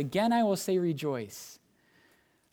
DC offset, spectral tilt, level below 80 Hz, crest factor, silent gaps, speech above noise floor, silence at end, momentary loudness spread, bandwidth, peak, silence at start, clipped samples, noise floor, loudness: under 0.1%; -5.5 dB/octave; -72 dBFS; 16 dB; none; 37 dB; 1 s; 18 LU; 18.5 kHz; -14 dBFS; 0 s; under 0.1%; -67 dBFS; -29 LUFS